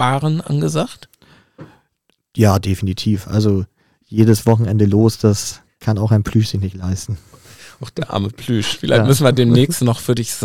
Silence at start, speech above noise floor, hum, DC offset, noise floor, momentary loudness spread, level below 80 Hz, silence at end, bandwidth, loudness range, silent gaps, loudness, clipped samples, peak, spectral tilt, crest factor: 0 s; 50 dB; none; under 0.1%; -66 dBFS; 13 LU; -46 dBFS; 0 s; 16 kHz; 4 LU; none; -16 LUFS; under 0.1%; 0 dBFS; -6 dB/octave; 16 dB